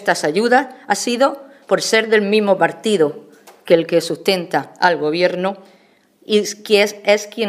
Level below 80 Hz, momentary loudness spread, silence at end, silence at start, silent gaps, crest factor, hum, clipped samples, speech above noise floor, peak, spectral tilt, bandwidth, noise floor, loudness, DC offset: -72 dBFS; 7 LU; 0 s; 0 s; none; 18 dB; none; under 0.1%; 37 dB; 0 dBFS; -3.5 dB/octave; 15.5 kHz; -53 dBFS; -17 LUFS; under 0.1%